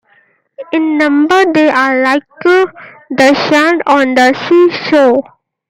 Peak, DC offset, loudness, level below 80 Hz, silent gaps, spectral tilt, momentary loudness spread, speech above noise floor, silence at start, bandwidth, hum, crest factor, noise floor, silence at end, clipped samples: 0 dBFS; under 0.1%; -10 LUFS; -58 dBFS; none; -4.5 dB/octave; 6 LU; 42 dB; 0.6 s; 15 kHz; none; 10 dB; -52 dBFS; 0.5 s; under 0.1%